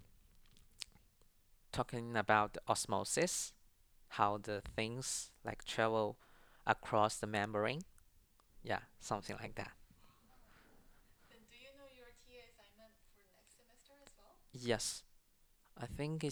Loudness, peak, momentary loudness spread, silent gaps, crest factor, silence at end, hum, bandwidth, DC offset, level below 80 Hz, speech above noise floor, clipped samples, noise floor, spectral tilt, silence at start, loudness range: -39 LUFS; -14 dBFS; 23 LU; none; 28 dB; 0 s; none; over 20 kHz; under 0.1%; -64 dBFS; 32 dB; under 0.1%; -71 dBFS; -3.5 dB/octave; 0 s; 10 LU